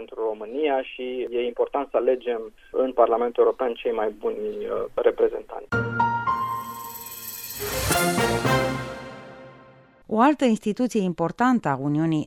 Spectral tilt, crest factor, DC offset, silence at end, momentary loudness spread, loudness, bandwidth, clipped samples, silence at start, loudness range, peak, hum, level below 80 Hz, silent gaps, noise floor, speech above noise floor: -5 dB/octave; 20 dB; under 0.1%; 0 s; 12 LU; -24 LUFS; 17 kHz; under 0.1%; 0 s; 2 LU; -4 dBFS; none; -48 dBFS; none; -51 dBFS; 28 dB